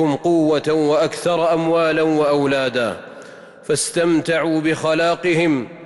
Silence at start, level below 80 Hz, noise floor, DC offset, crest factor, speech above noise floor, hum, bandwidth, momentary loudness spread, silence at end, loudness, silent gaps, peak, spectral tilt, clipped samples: 0 s; -58 dBFS; -39 dBFS; under 0.1%; 10 dB; 22 dB; none; 12 kHz; 6 LU; 0 s; -18 LUFS; none; -8 dBFS; -5 dB/octave; under 0.1%